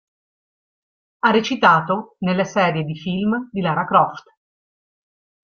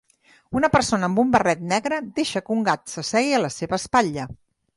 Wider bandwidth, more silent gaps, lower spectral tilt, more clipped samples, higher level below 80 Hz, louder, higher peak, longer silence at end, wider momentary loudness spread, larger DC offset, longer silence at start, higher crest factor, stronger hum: second, 7 kHz vs 11.5 kHz; neither; first, -6 dB/octave vs -4.5 dB/octave; neither; second, -60 dBFS vs -50 dBFS; first, -19 LUFS vs -22 LUFS; about the same, -2 dBFS vs -4 dBFS; first, 1.35 s vs 0.4 s; about the same, 8 LU vs 8 LU; neither; first, 1.25 s vs 0.5 s; about the same, 20 dB vs 18 dB; neither